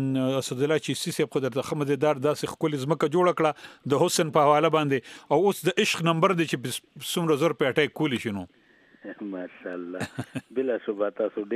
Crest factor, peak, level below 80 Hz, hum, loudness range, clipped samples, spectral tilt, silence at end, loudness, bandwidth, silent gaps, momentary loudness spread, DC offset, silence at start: 20 dB; -6 dBFS; -70 dBFS; none; 7 LU; under 0.1%; -5 dB/octave; 0 s; -25 LUFS; 15.5 kHz; none; 14 LU; under 0.1%; 0 s